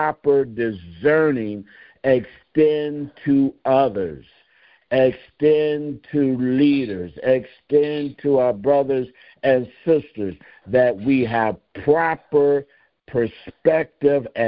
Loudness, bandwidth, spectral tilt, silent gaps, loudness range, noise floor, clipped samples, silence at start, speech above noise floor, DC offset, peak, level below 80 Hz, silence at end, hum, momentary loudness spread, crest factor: -20 LUFS; 5.2 kHz; -11.5 dB/octave; none; 1 LU; -56 dBFS; under 0.1%; 0 s; 37 dB; under 0.1%; -4 dBFS; -54 dBFS; 0 s; none; 9 LU; 16 dB